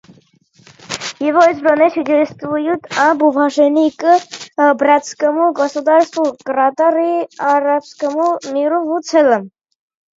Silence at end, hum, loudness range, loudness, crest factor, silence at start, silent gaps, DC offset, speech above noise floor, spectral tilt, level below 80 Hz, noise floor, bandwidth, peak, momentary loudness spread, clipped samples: 0.7 s; none; 2 LU; -14 LUFS; 14 dB; 0.9 s; none; under 0.1%; 37 dB; -4 dB/octave; -66 dBFS; -51 dBFS; 7.8 kHz; 0 dBFS; 7 LU; under 0.1%